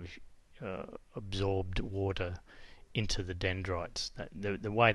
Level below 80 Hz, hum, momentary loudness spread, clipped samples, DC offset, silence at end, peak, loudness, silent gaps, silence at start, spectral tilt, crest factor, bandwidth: -46 dBFS; none; 14 LU; under 0.1%; under 0.1%; 0 s; -12 dBFS; -37 LUFS; none; 0 s; -5 dB/octave; 24 dB; 11.5 kHz